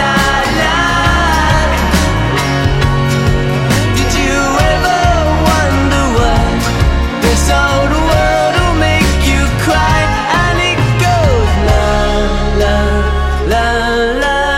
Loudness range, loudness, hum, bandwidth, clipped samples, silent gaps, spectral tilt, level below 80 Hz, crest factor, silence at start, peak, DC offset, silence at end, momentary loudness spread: 1 LU; -12 LUFS; none; 16.5 kHz; under 0.1%; none; -5 dB/octave; -16 dBFS; 10 dB; 0 s; 0 dBFS; under 0.1%; 0 s; 3 LU